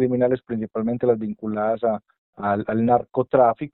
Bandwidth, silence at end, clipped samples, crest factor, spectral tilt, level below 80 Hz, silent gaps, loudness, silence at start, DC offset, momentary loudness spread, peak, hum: 4.1 kHz; 0.05 s; under 0.1%; 16 dB; -8 dB/octave; -58 dBFS; 2.18-2.33 s; -22 LUFS; 0 s; under 0.1%; 9 LU; -4 dBFS; none